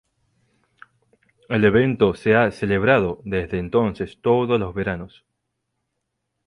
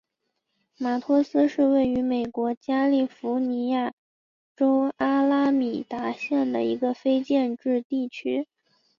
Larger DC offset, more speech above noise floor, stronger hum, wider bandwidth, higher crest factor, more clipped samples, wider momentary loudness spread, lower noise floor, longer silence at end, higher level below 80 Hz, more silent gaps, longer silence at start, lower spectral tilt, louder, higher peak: neither; about the same, 58 dB vs 55 dB; neither; first, 11 kHz vs 7 kHz; about the same, 18 dB vs 14 dB; neither; about the same, 9 LU vs 8 LU; about the same, -77 dBFS vs -79 dBFS; first, 1.4 s vs 0.55 s; first, -46 dBFS vs -64 dBFS; second, none vs 2.57-2.61 s, 3.93-4.55 s, 7.85-7.90 s; first, 1.5 s vs 0.8 s; first, -8 dB/octave vs -6.5 dB/octave; first, -20 LUFS vs -25 LUFS; first, -4 dBFS vs -10 dBFS